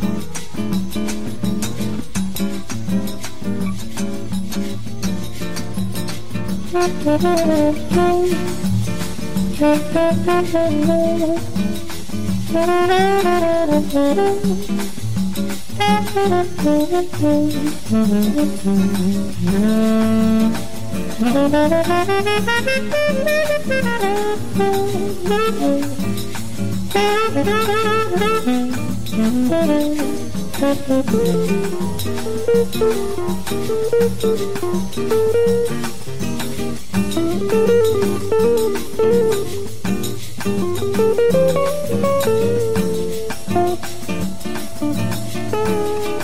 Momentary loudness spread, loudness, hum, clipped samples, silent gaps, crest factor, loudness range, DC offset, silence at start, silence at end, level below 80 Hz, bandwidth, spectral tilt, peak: 10 LU; -19 LUFS; none; under 0.1%; none; 14 dB; 5 LU; 7%; 0 s; 0 s; -40 dBFS; 16 kHz; -5.5 dB/octave; -4 dBFS